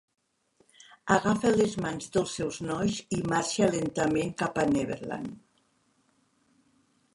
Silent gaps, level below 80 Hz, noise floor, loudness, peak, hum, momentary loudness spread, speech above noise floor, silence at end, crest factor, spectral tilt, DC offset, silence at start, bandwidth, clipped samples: none; -58 dBFS; -70 dBFS; -28 LUFS; -6 dBFS; none; 9 LU; 42 dB; 1.75 s; 24 dB; -5 dB/octave; under 0.1%; 1.05 s; 11.5 kHz; under 0.1%